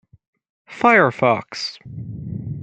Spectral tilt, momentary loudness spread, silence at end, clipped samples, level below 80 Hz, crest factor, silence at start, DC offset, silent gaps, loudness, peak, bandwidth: -5.5 dB/octave; 19 LU; 0 s; under 0.1%; -54 dBFS; 20 dB; 0.7 s; under 0.1%; none; -18 LUFS; -2 dBFS; 9 kHz